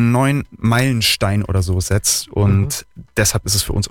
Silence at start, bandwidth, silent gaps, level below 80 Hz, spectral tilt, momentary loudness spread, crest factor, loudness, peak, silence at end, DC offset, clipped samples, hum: 0 s; 18 kHz; none; -34 dBFS; -4 dB/octave; 4 LU; 12 dB; -17 LUFS; -4 dBFS; 0 s; under 0.1%; under 0.1%; none